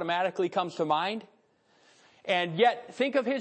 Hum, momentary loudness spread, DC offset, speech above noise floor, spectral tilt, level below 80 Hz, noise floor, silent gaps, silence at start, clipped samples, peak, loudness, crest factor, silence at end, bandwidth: none; 7 LU; under 0.1%; 38 dB; -5.5 dB/octave; -86 dBFS; -66 dBFS; none; 0 s; under 0.1%; -12 dBFS; -28 LUFS; 18 dB; 0 s; 8.8 kHz